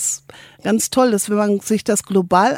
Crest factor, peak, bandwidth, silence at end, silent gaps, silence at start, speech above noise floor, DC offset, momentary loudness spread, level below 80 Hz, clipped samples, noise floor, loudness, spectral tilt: 16 dB; 0 dBFS; 16.5 kHz; 0 s; none; 0 s; 22 dB; under 0.1%; 6 LU; -56 dBFS; under 0.1%; -38 dBFS; -18 LUFS; -4 dB/octave